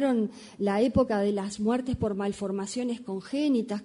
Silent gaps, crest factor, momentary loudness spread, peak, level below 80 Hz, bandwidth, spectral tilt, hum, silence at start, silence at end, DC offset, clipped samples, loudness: none; 16 dB; 8 LU; -12 dBFS; -50 dBFS; 11 kHz; -6 dB/octave; none; 0 s; 0 s; under 0.1%; under 0.1%; -28 LUFS